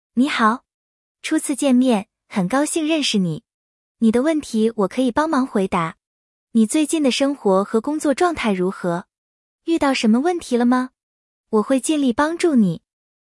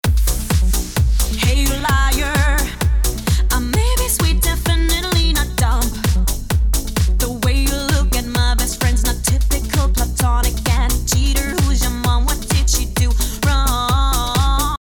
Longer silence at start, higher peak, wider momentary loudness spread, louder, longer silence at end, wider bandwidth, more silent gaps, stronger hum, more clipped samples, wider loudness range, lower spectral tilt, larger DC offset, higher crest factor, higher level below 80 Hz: about the same, 0.15 s vs 0.05 s; about the same, -4 dBFS vs -4 dBFS; first, 8 LU vs 2 LU; about the same, -19 LUFS vs -17 LUFS; first, 0.55 s vs 0.05 s; second, 12 kHz vs over 20 kHz; first, 0.74-1.15 s, 3.54-3.95 s, 6.07-6.47 s, 9.18-9.59 s, 11.03-11.44 s vs none; neither; neither; about the same, 1 LU vs 1 LU; about the same, -5 dB/octave vs -4 dB/octave; neither; about the same, 16 dB vs 12 dB; second, -56 dBFS vs -18 dBFS